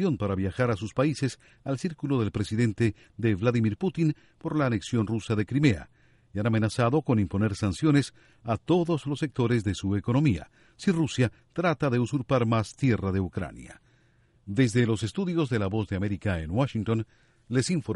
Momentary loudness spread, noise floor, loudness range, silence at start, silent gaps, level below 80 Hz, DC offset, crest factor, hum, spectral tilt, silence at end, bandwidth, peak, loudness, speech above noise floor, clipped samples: 8 LU; -63 dBFS; 2 LU; 0 s; none; -52 dBFS; under 0.1%; 18 dB; none; -7 dB/octave; 0 s; 11.5 kHz; -8 dBFS; -27 LUFS; 37 dB; under 0.1%